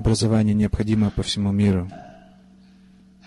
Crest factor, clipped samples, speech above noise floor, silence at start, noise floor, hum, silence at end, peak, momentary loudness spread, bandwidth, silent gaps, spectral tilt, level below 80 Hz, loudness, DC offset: 12 dB; under 0.1%; 31 dB; 0 s; -51 dBFS; none; 1.15 s; -10 dBFS; 8 LU; 11.5 kHz; none; -6.5 dB/octave; -36 dBFS; -21 LUFS; under 0.1%